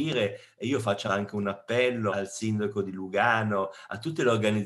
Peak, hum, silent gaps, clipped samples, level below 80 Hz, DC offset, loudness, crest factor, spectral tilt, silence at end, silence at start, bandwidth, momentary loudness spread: -8 dBFS; none; none; under 0.1%; -74 dBFS; under 0.1%; -28 LUFS; 18 dB; -5.5 dB/octave; 0 s; 0 s; 12.5 kHz; 8 LU